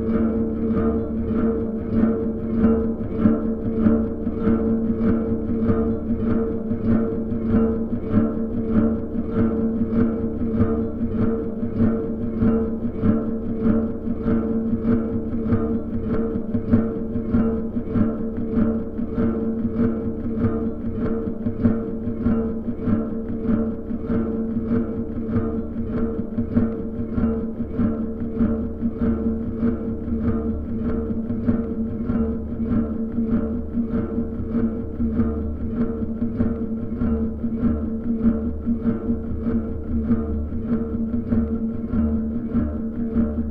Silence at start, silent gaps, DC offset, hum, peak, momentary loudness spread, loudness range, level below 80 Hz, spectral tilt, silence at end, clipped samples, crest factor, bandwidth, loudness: 0 s; none; under 0.1%; none; -4 dBFS; 5 LU; 3 LU; -32 dBFS; -12 dB/octave; 0 s; under 0.1%; 18 dB; 3.4 kHz; -23 LUFS